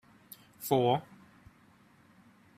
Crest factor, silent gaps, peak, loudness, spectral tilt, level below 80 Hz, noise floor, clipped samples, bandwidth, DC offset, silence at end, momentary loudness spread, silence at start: 22 dB; none; -12 dBFS; -30 LUFS; -6 dB/octave; -72 dBFS; -62 dBFS; under 0.1%; 15 kHz; under 0.1%; 1.55 s; 25 LU; 0.6 s